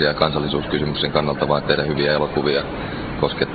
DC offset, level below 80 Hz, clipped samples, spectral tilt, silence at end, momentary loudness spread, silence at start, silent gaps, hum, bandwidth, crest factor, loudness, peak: under 0.1%; -38 dBFS; under 0.1%; -9.5 dB/octave; 0 s; 5 LU; 0 s; none; none; 4.9 kHz; 20 dB; -20 LUFS; 0 dBFS